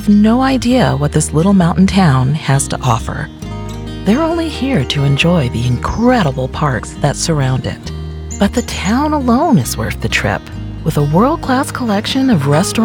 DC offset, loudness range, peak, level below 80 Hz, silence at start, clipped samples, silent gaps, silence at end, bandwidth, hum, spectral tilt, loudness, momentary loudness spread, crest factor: under 0.1%; 3 LU; 0 dBFS; -28 dBFS; 0 s; under 0.1%; none; 0 s; 19 kHz; none; -5.5 dB/octave; -14 LUFS; 11 LU; 12 dB